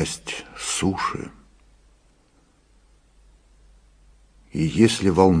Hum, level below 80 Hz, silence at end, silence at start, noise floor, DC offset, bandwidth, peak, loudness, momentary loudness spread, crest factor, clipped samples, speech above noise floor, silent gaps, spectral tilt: none; -48 dBFS; 0 s; 0 s; -59 dBFS; under 0.1%; 10.5 kHz; -2 dBFS; -22 LUFS; 16 LU; 22 dB; under 0.1%; 39 dB; none; -5 dB/octave